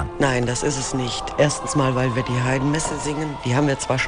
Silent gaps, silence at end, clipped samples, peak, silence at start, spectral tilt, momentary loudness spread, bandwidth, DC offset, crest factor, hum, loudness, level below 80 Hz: none; 0 s; under 0.1%; -4 dBFS; 0 s; -5 dB/octave; 5 LU; 10 kHz; under 0.1%; 16 dB; none; -22 LUFS; -40 dBFS